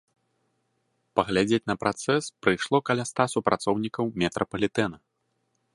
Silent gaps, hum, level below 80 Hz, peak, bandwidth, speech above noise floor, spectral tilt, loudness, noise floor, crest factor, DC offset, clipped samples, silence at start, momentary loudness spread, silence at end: none; none; -58 dBFS; -4 dBFS; 11.5 kHz; 49 dB; -5 dB/octave; -26 LUFS; -75 dBFS; 24 dB; under 0.1%; under 0.1%; 1.15 s; 4 LU; 0.8 s